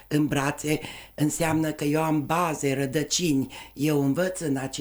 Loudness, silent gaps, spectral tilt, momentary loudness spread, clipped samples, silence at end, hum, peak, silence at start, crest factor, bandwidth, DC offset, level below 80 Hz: -26 LUFS; none; -5 dB/octave; 5 LU; under 0.1%; 0 s; none; -10 dBFS; 0.1 s; 14 dB; over 20 kHz; under 0.1%; -52 dBFS